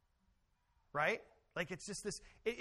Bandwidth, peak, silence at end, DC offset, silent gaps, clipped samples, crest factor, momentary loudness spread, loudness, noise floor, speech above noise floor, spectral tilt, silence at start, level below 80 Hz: 13 kHz; -22 dBFS; 0 s; under 0.1%; none; under 0.1%; 22 dB; 9 LU; -42 LUFS; -77 dBFS; 36 dB; -3.5 dB/octave; 0.95 s; -68 dBFS